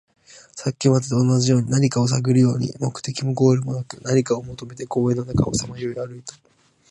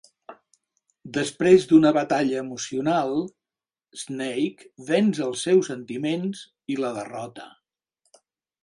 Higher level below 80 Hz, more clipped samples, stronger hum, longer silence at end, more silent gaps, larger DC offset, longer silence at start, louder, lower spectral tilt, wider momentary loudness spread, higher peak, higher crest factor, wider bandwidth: first, -48 dBFS vs -66 dBFS; neither; neither; second, 0.6 s vs 1.15 s; neither; neither; about the same, 0.35 s vs 0.3 s; about the same, -21 LUFS vs -23 LUFS; about the same, -6.5 dB/octave vs -5.5 dB/octave; second, 13 LU vs 20 LU; about the same, -4 dBFS vs -4 dBFS; about the same, 18 dB vs 20 dB; about the same, 11 kHz vs 11.5 kHz